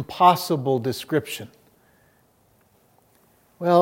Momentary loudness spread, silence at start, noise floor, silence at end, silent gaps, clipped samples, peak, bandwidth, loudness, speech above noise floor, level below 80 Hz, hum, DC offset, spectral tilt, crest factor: 17 LU; 0 s; -61 dBFS; 0 s; none; under 0.1%; -4 dBFS; 16.5 kHz; -22 LUFS; 39 dB; -68 dBFS; none; under 0.1%; -5.5 dB/octave; 20 dB